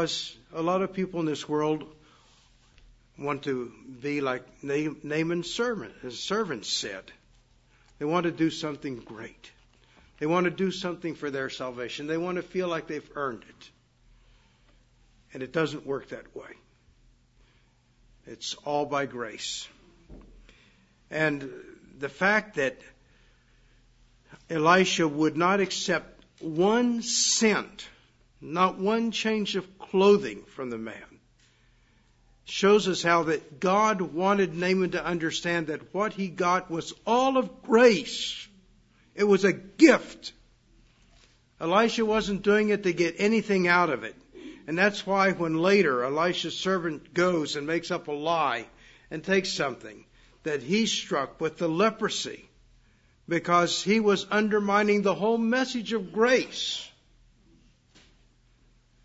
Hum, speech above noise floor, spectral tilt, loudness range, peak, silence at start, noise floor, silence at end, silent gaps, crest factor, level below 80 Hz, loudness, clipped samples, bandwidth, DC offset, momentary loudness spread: none; 37 dB; -4 dB/octave; 10 LU; -4 dBFS; 0 s; -63 dBFS; 2.15 s; none; 24 dB; -62 dBFS; -26 LUFS; under 0.1%; 8 kHz; under 0.1%; 15 LU